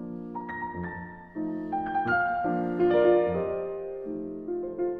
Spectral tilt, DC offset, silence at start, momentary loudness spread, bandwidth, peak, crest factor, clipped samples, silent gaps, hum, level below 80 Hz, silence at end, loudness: -9.5 dB/octave; under 0.1%; 0 s; 14 LU; 4.6 kHz; -12 dBFS; 18 dB; under 0.1%; none; none; -58 dBFS; 0 s; -28 LUFS